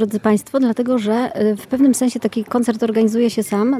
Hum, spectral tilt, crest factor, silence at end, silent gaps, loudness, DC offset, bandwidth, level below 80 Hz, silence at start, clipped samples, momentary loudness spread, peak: none; -5.5 dB/octave; 14 dB; 0 s; none; -17 LUFS; under 0.1%; 15 kHz; -60 dBFS; 0 s; under 0.1%; 4 LU; -4 dBFS